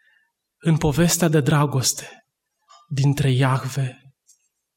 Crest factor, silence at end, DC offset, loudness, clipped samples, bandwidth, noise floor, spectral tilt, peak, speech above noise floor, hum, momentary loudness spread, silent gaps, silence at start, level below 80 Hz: 16 dB; 0.85 s; under 0.1%; -20 LUFS; under 0.1%; 16.5 kHz; -66 dBFS; -5 dB/octave; -6 dBFS; 46 dB; none; 12 LU; none; 0.65 s; -46 dBFS